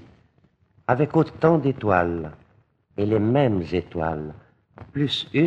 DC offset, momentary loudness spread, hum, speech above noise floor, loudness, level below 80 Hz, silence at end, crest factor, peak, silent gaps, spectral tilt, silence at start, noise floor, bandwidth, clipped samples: under 0.1%; 14 LU; none; 40 dB; -23 LUFS; -50 dBFS; 0 s; 20 dB; -4 dBFS; none; -8 dB/octave; 0.9 s; -62 dBFS; 8.4 kHz; under 0.1%